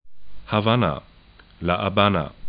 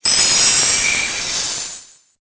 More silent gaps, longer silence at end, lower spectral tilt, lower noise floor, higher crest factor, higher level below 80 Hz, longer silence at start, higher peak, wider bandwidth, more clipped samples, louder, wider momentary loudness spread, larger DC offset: neither; second, 0 s vs 0.4 s; first, -11 dB/octave vs 1 dB/octave; first, -50 dBFS vs -37 dBFS; first, 22 dB vs 16 dB; about the same, -46 dBFS vs -46 dBFS; about the same, 0.05 s vs 0.05 s; about the same, -2 dBFS vs -2 dBFS; second, 5 kHz vs 8 kHz; neither; second, -22 LUFS vs -13 LUFS; second, 9 LU vs 15 LU; neither